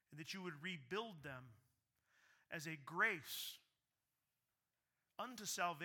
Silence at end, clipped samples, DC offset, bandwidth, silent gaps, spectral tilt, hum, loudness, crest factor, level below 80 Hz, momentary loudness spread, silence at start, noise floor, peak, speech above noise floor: 0 s; under 0.1%; under 0.1%; 19 kHz; none; -2.5 dB/octave; none; -46 LUFS; 24 dB; -88 dBFS; 15 LU; 0.1 s; under -90 dBFS; -26 dBFS; over 44 dB